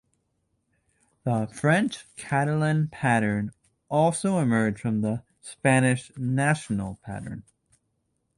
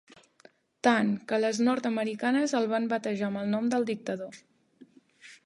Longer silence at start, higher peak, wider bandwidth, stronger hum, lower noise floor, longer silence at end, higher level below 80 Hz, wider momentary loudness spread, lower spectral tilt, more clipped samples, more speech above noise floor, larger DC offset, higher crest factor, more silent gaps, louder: first, 1.25 s vs 0.85 s; about the same, -6 dBFS vs -8 dBFS; about the same, 11.5 kHz vs 11.5 kHz; neither; first, -75 dBFS vs -60 dBFS; first, 0.95 s vs 0.1 s; first, -58 dBFS vs -80 dBFS; first, 14 LU vs 7 LU; about the same, -6 dB/octave vs -5 dB/octave; neither; first, 50 dB vs 32 dB; neither; about the same, 20 dB vs 22 dB; neither; first, -25 LUFS vs -28 LUFS